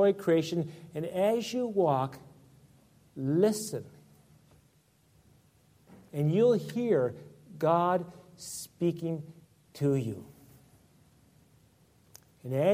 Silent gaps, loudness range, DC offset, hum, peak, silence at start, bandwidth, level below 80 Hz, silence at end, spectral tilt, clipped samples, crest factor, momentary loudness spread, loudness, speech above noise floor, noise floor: none; 6 LU; under 0.1%; none; -14 dBFS; 0 s; 16 kHz; -70 dBFS; 0 s; -6.5 dB/octave; under 0.1%; 18 dB; 20 LU; -30 LUFS; 37 dB; -66 dBFS